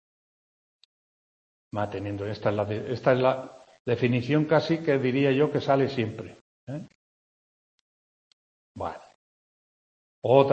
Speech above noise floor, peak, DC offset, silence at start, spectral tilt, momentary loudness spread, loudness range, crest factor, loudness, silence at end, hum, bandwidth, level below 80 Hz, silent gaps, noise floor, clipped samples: over 65 dB; -4 dBFS; under 0.1%; 1.75 s; -8 dB/octave; 16 LU; 18 LU; 24 dB; -26 LUFS; 0 s; none; 8.4 kHz; -66 dBFS; 3.80-3.85 s, 6.41-6.67 s, 6.95-8.75 s, 9.15-10.22 s; under -90 dBFS; under 0.1%